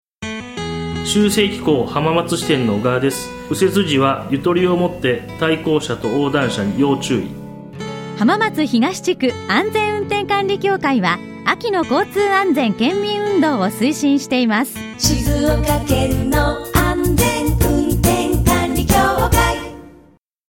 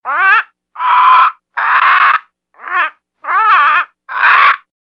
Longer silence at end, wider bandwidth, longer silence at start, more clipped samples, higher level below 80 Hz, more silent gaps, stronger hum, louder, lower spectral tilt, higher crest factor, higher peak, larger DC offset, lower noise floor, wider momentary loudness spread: first, 0.6 s vs 0.3 s; first, 17 kHz vs 6.2 kHz; first, 0.2 s vs 0.05 s; neither; first, -30 dBFS vs -78 dBFS; neither; second, none vs 60 Hz at -80 dBFS; second, -17 LUFS vs -10 LUFS; first, -5 dB/octave vs 0.5 dB/octave; first, 16 dB vs 10 dB; about the same, 0 dBFS vs 0 dBFS; neither; first, -50 dBFS vs -36 dBFS; second, 7 LU vs 11 LU